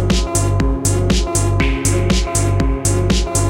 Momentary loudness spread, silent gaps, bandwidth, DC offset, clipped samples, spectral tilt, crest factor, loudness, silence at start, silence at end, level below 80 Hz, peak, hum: 1 LU; none; 17 kHz; under 0.1%; under 0.1%; -5 dB/octave; 12 dB; -16 LUFS; 0 s; 0 s; -20 dBFS; -4 dBFS; none